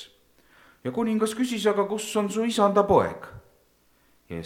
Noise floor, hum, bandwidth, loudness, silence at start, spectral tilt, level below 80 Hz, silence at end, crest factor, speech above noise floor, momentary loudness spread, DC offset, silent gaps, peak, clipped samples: -63 dBFS; none; 16.5 kHz; -24 LUFS; 0 s; -5 dB/octave; -58 dBFS; 0 s; 20 dB; 40 dB; 16 LU; under 0.1%; none; -6 dBFS; under 0.1%